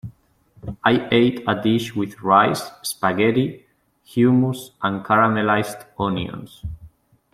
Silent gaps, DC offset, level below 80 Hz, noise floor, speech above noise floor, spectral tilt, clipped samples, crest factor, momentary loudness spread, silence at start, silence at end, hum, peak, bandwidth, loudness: none; under 0.1%; -50 dBFS; -55 dBFS; 36 dB; -6 dB/octave; under 0.1%; 18 dB; 17 LU; 0.05 s; 0.45 s; none; -2 dBFS; 15.5 kHz; -20 LUFS